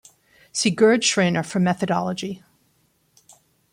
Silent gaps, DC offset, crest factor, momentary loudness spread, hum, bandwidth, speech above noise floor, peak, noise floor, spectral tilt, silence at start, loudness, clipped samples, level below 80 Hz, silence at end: none; under 0.1%; 18 dB; 14 LU; none; 11.5 kHz; 44 dB; -4 dBFS; -65 dBFS; -4 dB/octave; 0.55 s; -20 LUFS; under 0.1%; -64 dBFS; 1.35 s